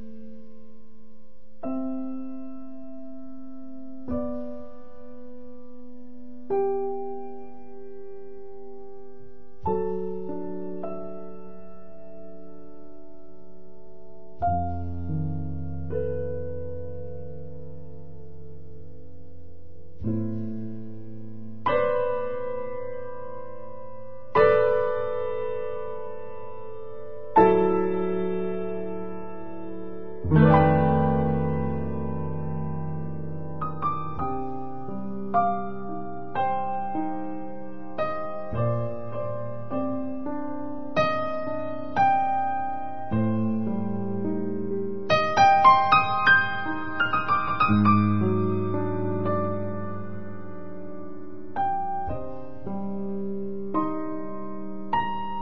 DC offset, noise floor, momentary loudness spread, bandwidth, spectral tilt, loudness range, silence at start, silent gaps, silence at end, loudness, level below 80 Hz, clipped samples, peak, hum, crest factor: 3%; -55 dBFS; 24 LU; 6.2 kHz; -8 dB/octave; 16 LU; 0 s; none; 0 s; -26 LUFS; -50 dBFS; under 0.1%; -4 dBFS; none; 22 dB